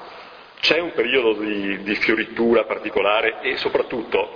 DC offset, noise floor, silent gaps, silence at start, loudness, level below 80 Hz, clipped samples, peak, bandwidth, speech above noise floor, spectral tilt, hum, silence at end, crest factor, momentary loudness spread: under 0.1%; -41 dBFS; none; 0 s; -20 LUFS; -54 dBFS; under 0.1%; -2 dBFS; 5.4 kHz; 21 dB; -5 dB/octave; none; 0 s; 20 dB; 5 LU